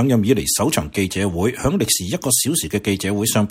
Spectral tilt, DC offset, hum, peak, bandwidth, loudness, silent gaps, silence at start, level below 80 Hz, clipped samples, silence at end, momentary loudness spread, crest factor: -4 dB/octave; under 0.1%; none; -2 dBFS; 16.5 kHz; -18 LUFS; none; 0 s; -42 dBFS; under 0.1%; 0 s; 4 LU; 18 dB